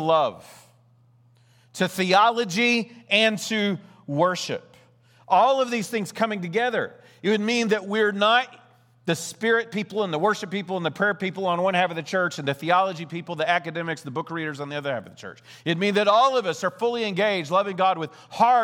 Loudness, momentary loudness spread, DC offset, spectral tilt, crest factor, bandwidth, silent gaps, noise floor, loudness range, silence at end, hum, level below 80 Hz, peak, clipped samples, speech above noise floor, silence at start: -23 LUFS; 12 LU; under 0.1%; -4.5 dB/octave; 20 dB; 19.5 kHz; none; -58 dBFS; 3 LU; 0 s; none; -76 dBFS; -4 dBFS; under 0.1%; 35 dB; 0 s